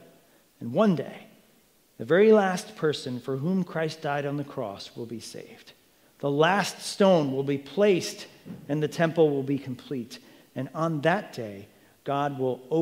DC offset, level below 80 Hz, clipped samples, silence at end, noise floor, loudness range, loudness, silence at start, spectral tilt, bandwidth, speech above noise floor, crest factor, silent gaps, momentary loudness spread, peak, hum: under 0.1%; -76 dBFS; under 0.1%; 0 s; -62 dBFS; 5 LU; -26 LUFS; 0.6 s; -6 dB/octave; 16 kHz; 36 dB; 20 dB; none; 19 LU; -8 dBFS; none